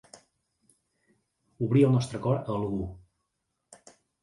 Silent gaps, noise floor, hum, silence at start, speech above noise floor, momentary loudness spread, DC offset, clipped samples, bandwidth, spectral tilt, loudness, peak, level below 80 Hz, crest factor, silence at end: none; -81 dBFS; none; 1.6 s; 55 dB; 12 LU; under 0.1%; under 0.1%; 11.5 kHz; -8 dB/octave; -27 LUFS; -10 dBFS; -56 dBFS; 20 dB; 1.25 s